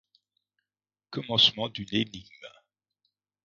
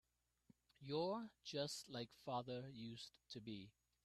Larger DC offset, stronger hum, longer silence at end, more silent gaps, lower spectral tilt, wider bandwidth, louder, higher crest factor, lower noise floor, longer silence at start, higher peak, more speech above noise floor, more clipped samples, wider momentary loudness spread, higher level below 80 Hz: neither; first, 50 Hz at -60 dBFS vs none; first, 0.95 s vs 0.35 s; neither; second, -2 dB/octave vs -5 dB/octave; second, 7.4 kHz vs 13.5 kHz; first, -25 LUFS vs -49 LUFS; first, 24 dB vs 18 dB; first, under -90 dBFS vs -77 dBFS; first, 1.1 s vs 0.8 s; first, -8 dBFS vs -32 dBFS; first, over 62 dB vs 28 dB; neither; first, 18 LU vs 12 LU; first, -64 dBFS vs -82 dBFS